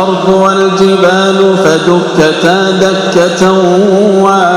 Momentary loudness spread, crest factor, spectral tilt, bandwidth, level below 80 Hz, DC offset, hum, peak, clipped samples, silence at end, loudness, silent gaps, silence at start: 2 LU; 8 dB; -5 dB/octave; 12.5 kHz; -44 dBFS; under 0.1%; none; 0 dBFS; 3%; 0 s; -7 LUFS; none; 0 s